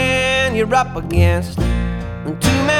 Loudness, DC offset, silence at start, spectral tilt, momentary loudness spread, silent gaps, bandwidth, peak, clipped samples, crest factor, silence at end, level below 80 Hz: -17 LUFS; under 0.1%; 0 s; -5 dB/octave; 8 LU; none; 17 kHz; 0 dBFS; under 0.1%; 16 dB; 0 s; -26 dBFS